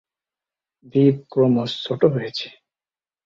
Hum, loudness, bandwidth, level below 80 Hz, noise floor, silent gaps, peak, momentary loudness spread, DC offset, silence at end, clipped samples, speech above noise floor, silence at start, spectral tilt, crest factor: none; -20 LUFS; 7.4 kHz; -60 dBFS; under -90 dBFS; none; -4 dBFS; 11 LU; under 0.1%; 0.75 s; under 0.1%; over 71 dB; 0.95 s; -8 dB/octave; 20 dB